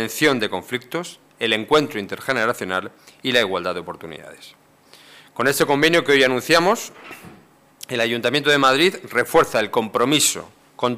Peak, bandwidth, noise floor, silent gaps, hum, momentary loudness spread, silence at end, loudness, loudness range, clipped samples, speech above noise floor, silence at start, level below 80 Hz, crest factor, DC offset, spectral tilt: -6 dBFS; 16 kHz; -50 dBFS; none; none; 19 LU; 0 s; -19 LUFS; 6 LU; under 0.1%; 30 dB; 0 s; -56 dBFS; 16 dB; under 0.1%; -3 dB/octave